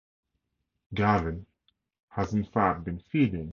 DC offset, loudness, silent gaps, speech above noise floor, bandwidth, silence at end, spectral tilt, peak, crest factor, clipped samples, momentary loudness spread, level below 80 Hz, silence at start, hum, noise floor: under 0.1%; -28 LUFS; 2.03-2.08 s; 54 dB; 7 kHz; 0.05 s; -8 dB/octave; -8 dBFS; 22 dB; under 0.1%; 12 LU; -48 dBFS; 0.9 s; none; -81 dBFS